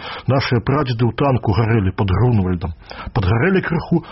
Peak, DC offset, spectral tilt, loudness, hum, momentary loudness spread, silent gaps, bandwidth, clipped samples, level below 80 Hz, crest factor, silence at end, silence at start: -6 dBFS; under 0.1%; -6.5 dB/octave; -18 LUFS; none; 7 LU; none; 5.8 kHz; under 0.1%; -36 dBFS; 12 dB; 0 s; 0 s